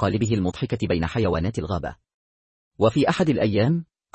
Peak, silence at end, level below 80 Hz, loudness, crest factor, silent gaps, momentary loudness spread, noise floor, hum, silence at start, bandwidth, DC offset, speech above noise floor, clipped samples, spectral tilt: -8 dBFS; 0.3 s; -46 dBFS; -23 LUFS; 16 dB; 2.14-2.71 s; 8 LU; under -90 dBFS; none; 0 s; 8.8 kHz; under 0.1%; over 68 dB; under 0.1%; -7 dB/octave